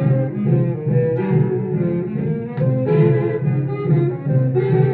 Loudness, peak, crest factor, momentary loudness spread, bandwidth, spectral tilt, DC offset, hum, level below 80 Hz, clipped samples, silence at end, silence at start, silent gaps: -19 LUFS; -4 dBFS; 14 dB; 5 LU; 4 kHz; -13.5 dB/octave; under 0.1%; none; -54 dBFS; under 0.1%; 0 s; 0 s; none